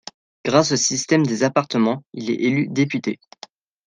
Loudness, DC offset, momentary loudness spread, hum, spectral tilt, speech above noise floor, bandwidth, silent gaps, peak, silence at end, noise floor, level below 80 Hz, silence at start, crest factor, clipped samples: -20 LUFS; under 0.1%; 11 LU; none; -4.5 dB/octave; 26 dB; 10 kHz; none; -2 dBFS; 0.7 s; -46 dBFS; -64 dBFS; 0.45 s; 18 dB; under 0.1%